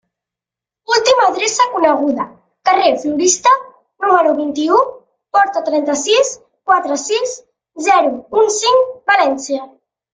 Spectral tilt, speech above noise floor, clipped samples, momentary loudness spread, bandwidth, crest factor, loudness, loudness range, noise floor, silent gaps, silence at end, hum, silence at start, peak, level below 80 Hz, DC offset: -1 dB/octave; 73 dB; under 0.1%; 9 LU; 9.6 kHz; 14 dB; -14 LUFS; 2 LU; -87 dBFS; none; 0.45 s; none; 0.9 s; 0 dBFS; -60 dBFS; under 0.1%